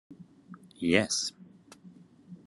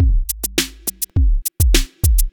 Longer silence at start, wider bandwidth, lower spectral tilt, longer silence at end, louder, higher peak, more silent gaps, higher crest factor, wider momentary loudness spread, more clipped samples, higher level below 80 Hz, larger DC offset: about the same, 0.1 s vs 0 s; second, 12 kHz vs over 20 kHz; about the same, -3 dB/octave vs -3.5 dB/octave; about the same, 0.1 s vs 0.05 s; second, -28 LUFS vs -19 LUFS; second, -8 dBFS vs 0 dBFS; neither; first, 26 dB vs 16 dB; first, 27 LU vs 5 LU; neither; second, -70 dBFS vs -18 dBFS; neither